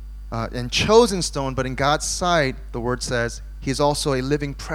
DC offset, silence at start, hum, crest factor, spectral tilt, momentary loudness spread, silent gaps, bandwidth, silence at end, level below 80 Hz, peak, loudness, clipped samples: under 0.1%; 0 s; none; 20 dB; -4 dB/octave; 12 LU; none; 16 kHz; 0 s; -34 dBFS; -2 dBFS; -21 LUFS; under 0.1%